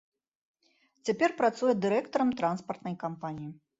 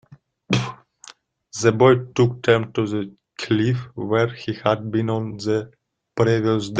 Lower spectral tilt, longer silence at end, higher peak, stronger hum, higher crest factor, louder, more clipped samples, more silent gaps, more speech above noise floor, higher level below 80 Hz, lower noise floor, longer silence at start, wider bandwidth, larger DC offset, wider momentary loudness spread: about the same, -6 dB/octave vs -6 dB/octave; first, 0.25 s vs 0 s; second, -14 dBFS vs -2 dBFS; neither; about the same, 18 dB vs 20 dB; second, -30 LUFS vs -21 LUFS; neither; neither; first, 41 dB vs 28 dB; second, -72 dBFS vs -56 dBFS; first, -70 dBFS vs -48 dBFS; first, 1.05 s vs 0.5 s; second, 8 kHz vs 9.2 kHz; neither; second, 12 LU vs 16 LU